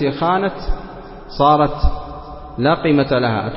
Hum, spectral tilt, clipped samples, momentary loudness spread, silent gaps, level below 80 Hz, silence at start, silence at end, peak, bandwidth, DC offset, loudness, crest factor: none; -10.5 dB/octave; under 0.1%; 18 LU; none; -26 dBFS; 0 s; 0 s; -2 dBFS; 5.8 kHz; under 0.1%; -17 LUFS; 16 dB